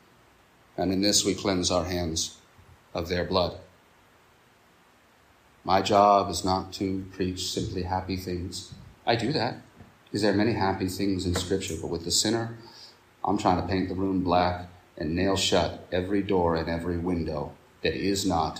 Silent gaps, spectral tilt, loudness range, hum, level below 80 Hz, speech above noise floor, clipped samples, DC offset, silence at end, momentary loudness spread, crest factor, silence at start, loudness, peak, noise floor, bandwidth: none; -4 dB/octave; 4 LU; none; -54 dBFS; 33 dB; under 0.1%; under 0.1%; 0 s; 13 LU; 22 dB; 0.75 s; -27 LUFS; -6 dBFS; -59 dBFS; 15.5 kHz